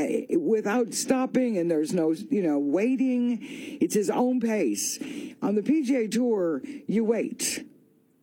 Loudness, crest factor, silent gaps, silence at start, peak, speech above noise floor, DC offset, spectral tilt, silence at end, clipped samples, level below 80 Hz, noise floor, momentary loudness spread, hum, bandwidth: -26 LUFS; 16 dB; none; 0 s; -10 dBFS; 35 dB; under 0.1%; -4.5 dB/octave; 0.6 s; under 0.1%; -76 dBFS; -60 dBFS; 5 LU; none; 17 kHz